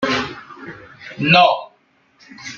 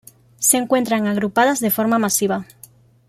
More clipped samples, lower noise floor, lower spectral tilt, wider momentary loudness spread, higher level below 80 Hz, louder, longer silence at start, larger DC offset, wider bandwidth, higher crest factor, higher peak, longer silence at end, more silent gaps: neither; first, -58 dBFS vs -48 dBFS; first, -5 dB/octave vs -3.5 dB/octave; first, 24 LU vs 3 LU; about the same, -56 dBFS vs -60 dBFS; first, -15 LUFS vs -18 LUFS; second, 0 s vs 0.4 s; neither; second, 7.6 kHz vs 16 kHz; about the same, 18 dB vs 18 dB; about the same, -2 dBFS vs 0 dBFS; second, 0 s vs 0.65 s; neither